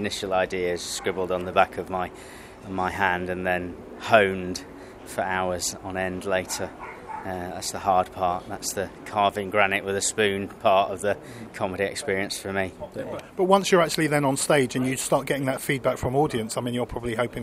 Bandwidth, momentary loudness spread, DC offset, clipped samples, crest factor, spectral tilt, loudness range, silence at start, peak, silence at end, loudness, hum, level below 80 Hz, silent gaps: 16 kHz; 13 LU; under 0.1%; under 0.1%; 24 dB; -4 dB/octave; 5 LU; 0 s; 0 dBFS; 0 s; -25 LUFS; none; -52 dBFS; none